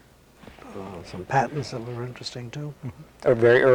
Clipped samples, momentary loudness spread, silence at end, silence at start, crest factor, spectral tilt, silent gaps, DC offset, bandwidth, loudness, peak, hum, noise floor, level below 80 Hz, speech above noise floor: under 0.1%; 20 LU; 0 s; 0.65 s; 18 dB; -6.5 dB/octave; none; under 0.1%; 12 kHz; -25 LUFS; -8 dBFS; none; -50 dBFS; -56 dBFS; 27 dB